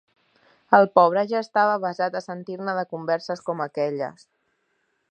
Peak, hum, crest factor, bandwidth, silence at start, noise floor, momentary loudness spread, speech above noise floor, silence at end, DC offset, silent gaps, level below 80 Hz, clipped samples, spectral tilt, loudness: -2 dBFS; none; 22 dB; 9 kHz; 0.7 s; -71 dBFS; 14 LU; 49 dB; 1 s; under 0.1%; none; -80 dBFS; under 0.1%; -6.5 dB/octave; -23 LUFS